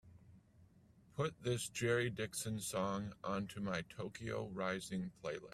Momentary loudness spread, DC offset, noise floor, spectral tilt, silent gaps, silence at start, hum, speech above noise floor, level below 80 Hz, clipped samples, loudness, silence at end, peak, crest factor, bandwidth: 8 LU; under 0.1%; -67 dBFS; -4.5 dB/octave; none; 0.05 s; none; 26 dB; -70 dBFS; under 0.1%; -41 LUFS; 0 s; -22 dBFS; 20 dB; 15.5 kHz